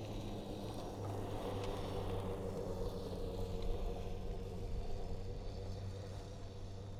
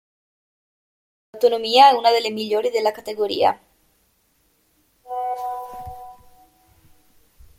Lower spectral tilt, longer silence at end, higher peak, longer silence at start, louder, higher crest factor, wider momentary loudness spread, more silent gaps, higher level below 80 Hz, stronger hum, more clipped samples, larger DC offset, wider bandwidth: first, -6.5 dB/octave vs -3 dB/octave; second, 0 s vs 1.45 s; second, -28 dBFS vs -2 dBFS; second, 0 s vs 1.35 s; second, -45 LUFS vs -19 LUFS; second, 14 dB vs 22 dB; second, 5 LU vs 22 LU; neither; first, -46 dBFS vs -58 dBFS; neither; neither; neither; about the same, 15 kHz vs 16.5 kHz